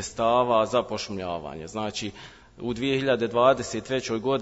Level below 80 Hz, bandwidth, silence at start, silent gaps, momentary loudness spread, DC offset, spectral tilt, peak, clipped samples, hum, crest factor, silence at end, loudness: -54 dBFS; 8 kHz; 0 s; none; 13 LU; under 0.1%; -4.5 dB/octave; -6 dBFS; under 0.1%; none; 18 dB; 0 s; -25 LUFS